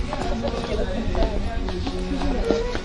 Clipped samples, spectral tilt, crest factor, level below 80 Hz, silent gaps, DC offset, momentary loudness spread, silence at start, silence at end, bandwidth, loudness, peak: under 0.1%; -6 dB/octave; 20 dB; -28 dBFS; none; under 0.1%; 4 LU; 0 s; 0 s; 11 kHz; -26 LUFS; -2 dBFS